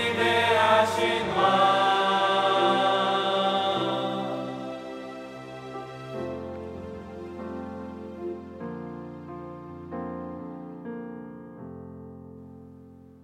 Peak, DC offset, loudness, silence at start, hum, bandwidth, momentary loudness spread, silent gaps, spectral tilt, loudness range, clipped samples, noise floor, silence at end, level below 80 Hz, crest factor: -8 dBFS; under 0.1%; -25 LUFS; 0 s; none; 15 kHz; 21 LU; none; -4.5 dB/octave; 17 LU; under 0.1%; -49 dBFS; 0.05 s; -66 dBFS; 20 dB